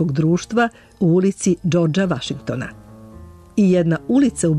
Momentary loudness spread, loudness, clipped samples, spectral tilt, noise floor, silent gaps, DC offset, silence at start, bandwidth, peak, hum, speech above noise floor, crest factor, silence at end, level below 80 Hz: 10 LU; -19 LUFS; under 0.1%; -6.5 dB/octave; -40 dBFS; none; under 0.1%; 0 s; 11.5 kHz; -6 dBFS; none; 23 dB; 12 dB; 0 s; -48 dBFS